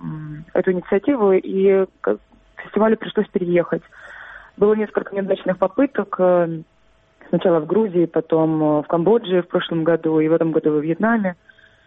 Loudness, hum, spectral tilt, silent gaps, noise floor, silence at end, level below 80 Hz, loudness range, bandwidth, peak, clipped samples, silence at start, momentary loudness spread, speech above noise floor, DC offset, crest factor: -19 LUFS; none; -10 dB/octave; none; -54 dBFS; 0.55 s; -58 dBFS; 3 LU; 4 kHz; -4 dBFS; under 0.1%; 0 s; 10 LU; 36 dB; under 0.1%; 16 dB